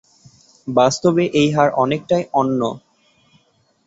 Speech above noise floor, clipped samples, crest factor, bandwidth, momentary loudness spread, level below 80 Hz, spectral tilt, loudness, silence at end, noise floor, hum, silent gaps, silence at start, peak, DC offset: 43 dB; under 0.1%; 18 dB; 8 kHz; 9 LU; -56 dBFS; -5.5 dB/octave; -17 LUFS; 1.1 s; -60 dBFS; none; none; 0.65 s; -2 dBFS; under 0.1%